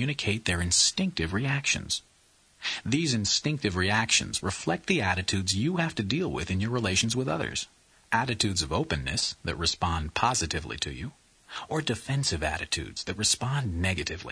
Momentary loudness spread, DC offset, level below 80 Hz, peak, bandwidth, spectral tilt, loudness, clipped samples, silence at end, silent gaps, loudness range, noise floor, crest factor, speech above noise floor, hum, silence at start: 8 LU; under 0.1%; -46 dBFS; -10 dBFS; 11 kHz; -3 dB/octave; -27 LUFS; under 0.1%; 0 s; none; 3 LU; -62 dBFS; 20 dB; 34 dB; none; 0 s